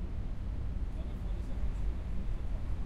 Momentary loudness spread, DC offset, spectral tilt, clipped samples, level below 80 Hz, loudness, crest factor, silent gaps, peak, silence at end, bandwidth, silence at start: 2 LU; under 0.1%; -8 dB/octave; under 0.1%; -36 dBFS; -40 LUFS; 12 dB; none; -22 dBFS; 0 s; 6.6 kHz; 0 s